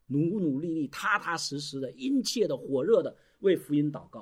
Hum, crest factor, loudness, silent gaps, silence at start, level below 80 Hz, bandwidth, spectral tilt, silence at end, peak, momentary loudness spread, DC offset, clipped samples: none; 16 dB; -29 LUFS; none; 0.1 s; -70 dBFS; 16 kHz; -5 dB/octave; 0 s; -12 dBFS; 7 LU; under 0.1%; under 0.1%